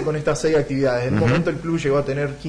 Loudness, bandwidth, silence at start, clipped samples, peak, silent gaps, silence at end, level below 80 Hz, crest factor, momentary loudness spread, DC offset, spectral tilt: -20 LUFS; 10.5 kHz; 0 s; under 0.1%; -10 dBFS; none; 0 s; -42 dBFS; 10 dB; 4 LU; under 0.1%; -6.5 dB/octave